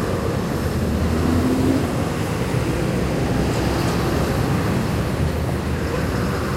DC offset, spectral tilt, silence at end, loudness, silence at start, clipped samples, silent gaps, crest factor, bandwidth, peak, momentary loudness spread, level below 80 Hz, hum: under 0.1%; -6.5 dB/octave; 0 s; -21 LUFS; 0 s; under 0.1%; none; 14 dB; 16 kHz; -6 dBFS; 4 LU; -30 dBFS; none